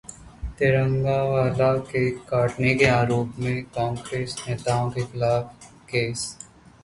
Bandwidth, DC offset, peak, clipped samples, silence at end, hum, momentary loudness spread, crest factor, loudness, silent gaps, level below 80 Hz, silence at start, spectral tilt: 11.5 kHz; under 0.1%; -4 dBFS; under 0.1%; 0.4 s; none; 13 LU; 20 dB; -24 LUFS; none; -46 dBFS; 0.1 s; -6 dB/octave